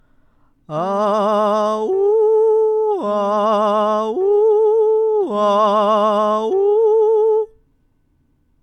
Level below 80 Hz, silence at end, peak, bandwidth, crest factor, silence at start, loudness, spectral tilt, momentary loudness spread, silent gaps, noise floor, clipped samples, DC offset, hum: -62 dBFS; 1.15 s; -4 dBFS; 8.6 kHz; 12 dB; 0.7 s; -16 LUFS; -6.5 dB/octave; 5 LU; none; -60 dBFS; under 0.1%; under 0.1%; none